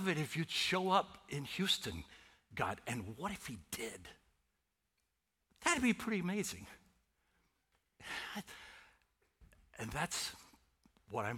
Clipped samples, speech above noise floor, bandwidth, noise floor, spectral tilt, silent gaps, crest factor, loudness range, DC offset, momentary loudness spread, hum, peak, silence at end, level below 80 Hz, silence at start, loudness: under 0.1%; 46 dB; 17.5 kHz; -85 dBFS; -3.5 dB/octave; none; 24 dB; 9 LU; under 0.1%; 20 LU; none; -16 dBFS; 0 s; -66 dBFS; 0 s; -38 LUFS